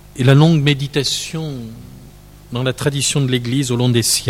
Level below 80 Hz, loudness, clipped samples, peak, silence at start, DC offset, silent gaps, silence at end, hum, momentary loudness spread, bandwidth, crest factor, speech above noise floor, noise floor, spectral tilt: -44 dBFS; -16 LUFS; under 0.1%; 0 dBFS; 0.15 s; under 0.1%; none; 0 s; 50 Hz at -40 dBFS; 15 LU; 16 kHz; 16 dB; 24 dB; -40 dBFS; -4.5 dB/octave